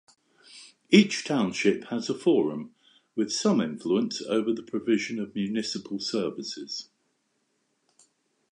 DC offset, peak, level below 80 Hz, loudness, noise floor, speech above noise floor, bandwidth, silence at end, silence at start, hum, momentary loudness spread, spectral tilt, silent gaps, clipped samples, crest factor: under 0.1%; -4 dBFS; -72 dBFS; -27 LUFS; -74 dBFS; 48 dB; 10.5 kHz; 1.7 s; 0.5 s; none; 15 LU; -5 dB/octave; none; under 0.1%; 24 dB